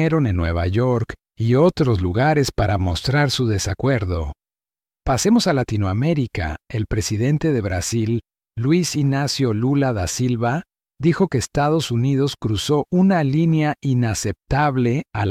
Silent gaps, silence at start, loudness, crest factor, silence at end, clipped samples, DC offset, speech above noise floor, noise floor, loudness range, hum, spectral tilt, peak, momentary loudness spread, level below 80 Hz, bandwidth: none; 0 s; -20 LUFS; 14 dB; 0 s; under 0.1%; under 0.1%; over 71 dB; under -90 dBFS; 2 LU; none; -6 dB/octave; -6 dBFS; 8 LU; -40 dBFS; 15.5 kHz